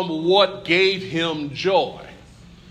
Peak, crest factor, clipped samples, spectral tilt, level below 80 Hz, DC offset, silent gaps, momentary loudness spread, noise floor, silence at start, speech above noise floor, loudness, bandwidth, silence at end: -4 dBFS; 18 dB; under 0.1%; -5 dB/octave; -54 dBFS; under 0.1%; none; 8 LU; -45 dBFS; 0 s; 25 dB; -20 LUFS; 9.4 kHz; 0.55 s